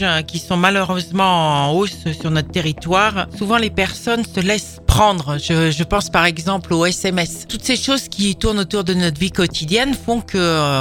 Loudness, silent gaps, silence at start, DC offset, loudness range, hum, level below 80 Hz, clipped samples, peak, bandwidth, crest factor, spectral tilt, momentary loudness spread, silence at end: -17 LUFS; none; 0 s; under 0.1%; 1 LU; none; -34 dBFS; under 0.1%; 0 dBFS; 18 kHz; 18 dB; -4.5 dB/octave; 6 LU; 0 s